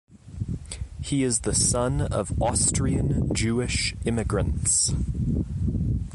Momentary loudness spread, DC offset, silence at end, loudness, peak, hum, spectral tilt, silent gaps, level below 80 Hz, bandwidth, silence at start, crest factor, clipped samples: 12 LU; under 0.1%; 0 s; -24 LUFS; -10 dBFS; none; -4.5 dB/octave; none; -34 dBFS; 11.5 kHz; 0.1 s; 14 dB; under 0.1%